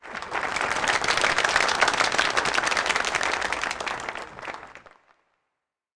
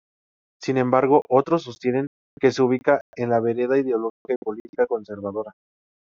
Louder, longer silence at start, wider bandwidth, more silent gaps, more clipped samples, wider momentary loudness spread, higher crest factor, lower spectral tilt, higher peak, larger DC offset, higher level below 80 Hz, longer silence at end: about the same, -23 LUFS vs -22 LUFS; second, 0 s vs 0.6 s; first, 10.5 kHz vs 7.4 kHz; second, none vs 2.07-2.37 s, 3.01-3.13 s, 4.10-4.25 s, 4.36-4.42 s, 4.60-4.73 s; neither; about the same, 14 LU vs 12 LU; about the same, 20 dB vs 18 dB; second, -1 dB/octave vs -6 dB/octave; second, -8 dBFS vs -4 dBFS; neither; first, -54 dBFS vs -66 dBFS; first, 1.2 s vs 0.65 s